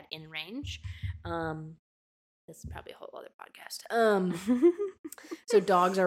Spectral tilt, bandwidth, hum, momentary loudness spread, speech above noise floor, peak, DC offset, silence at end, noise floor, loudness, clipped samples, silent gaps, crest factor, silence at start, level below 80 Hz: -5.5 dB/octave; 16 kHz; none; 21 LU; over 60 dB; -12 dBFS; under 0.1%; 0 s; under -90 dBFS; -29 LUFS; under 0.1%; 1.79-2.48 s, 3.34-3.39 s, 4.99-5.04 s; 18 dB; 0.1 s; -54 dBFS